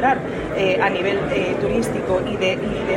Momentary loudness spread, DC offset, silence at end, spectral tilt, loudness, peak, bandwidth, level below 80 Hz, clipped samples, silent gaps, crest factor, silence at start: 4 LU; under 0.1%; 0 s; -5.5 dB/octave; -20 LUFS; -4 dBFS; 16 kHz; -42 dBFS; under 0.1%; none; 16 dB; 0 s